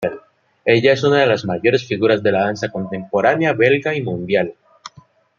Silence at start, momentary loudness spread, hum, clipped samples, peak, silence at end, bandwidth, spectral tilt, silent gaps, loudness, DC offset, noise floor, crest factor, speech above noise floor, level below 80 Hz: 0 s; 10 LU; none; under 0.1%; -2 dBFS; 0.5 s; 7.4 kHz; -6 dB/octave; none; -17 LUFS; under 0.1%; -49 dBFS; 16 dB; 33 dB; -60 dBFS